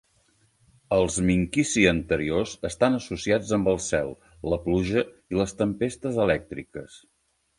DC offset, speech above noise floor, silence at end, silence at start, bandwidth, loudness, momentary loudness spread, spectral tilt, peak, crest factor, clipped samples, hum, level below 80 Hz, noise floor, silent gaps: under 0.1%; 40 dB; 0.6 s; 0.9 s; 11.5 kHz; -25 LUFS; 10 LU; -5 dB/octave; -4 dBFS; 22 dB; under 0.1%; none; -46 dBFS; -65 dBFS; none